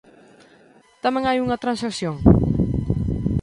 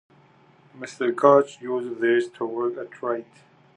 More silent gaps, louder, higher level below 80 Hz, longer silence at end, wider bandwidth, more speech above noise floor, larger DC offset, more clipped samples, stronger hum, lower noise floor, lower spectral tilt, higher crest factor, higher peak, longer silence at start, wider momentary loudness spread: neither; about the same, -21 LUFS vs -23 LUFS; first, -32 dBFS vs -82 dBFS; second, 0 s vs 0.55 s; first, 11.5 kHz vs 10 kHz; about the same, 33 dB vs 33 dB; neither; neither; neither; about the same, -53 dBFS vs -56 dBFS; first, -7.5 dB/octave vs -6 dB/octave; about the same, 20 dB vs 22 dB; about the same, 0 dBFS vs -2 dBFS; first, 1.05 s vs 0.75 s; second, 8 LU vs 15 LU